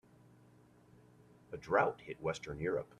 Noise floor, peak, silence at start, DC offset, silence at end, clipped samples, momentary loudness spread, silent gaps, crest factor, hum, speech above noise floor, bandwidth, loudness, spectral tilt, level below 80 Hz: -64 dBFS; -16 dBFS; 1.5 s; under 0.1%; 0.15 s; under 0.1%; 14 LU; none; 24 dB; none; 27 dB; 12 kHz; -37 LUFS; -6 dB/octave; -66 dBFS